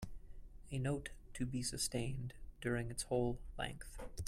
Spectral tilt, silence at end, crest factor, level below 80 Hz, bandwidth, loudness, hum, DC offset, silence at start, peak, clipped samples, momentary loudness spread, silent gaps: -4.5 dB/octave; 0 s; 18 dB; -52 dBFS; 16 kHz; -42 LUFS; none; under 0.1%; 0 s; -24 dBFS; under 0.1%; 14 LU; none